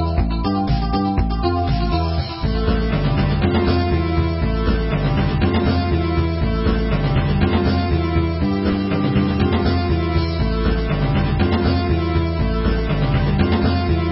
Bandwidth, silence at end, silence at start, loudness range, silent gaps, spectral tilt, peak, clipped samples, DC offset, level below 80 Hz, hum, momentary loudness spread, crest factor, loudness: 5.8 kHz; 0 s; 0 s; 1 LU; none; -12 dB/octave; -4 dBFS; under 0.1%; under 0.1%; -22 dBFS; none; 3 LU; 14 dB; -19 LUFS